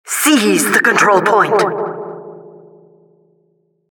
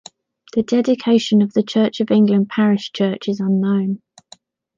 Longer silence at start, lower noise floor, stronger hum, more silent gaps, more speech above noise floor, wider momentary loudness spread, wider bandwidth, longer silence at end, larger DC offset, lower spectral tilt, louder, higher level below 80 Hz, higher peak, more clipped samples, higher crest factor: second, 0.05 s vs 0.55 s; first, -60 dBFS vs -49 dBFS; neither; neither; first, 48 dB vs 33 dB; first, 17 LU vs 8 LU; first, 19 kHz vs 7.6 kHz; first, 1.45 s vs 0.8 s; neither; second, -3 dB/octave vs -7 dB/octave; first, -12 LUFS vs -17 LUFS; second, -72 dBFS vs -64 dBFS; first, 0 dBFS vs -4 dBFS; neither; about the same, 16 dB vs 14 dB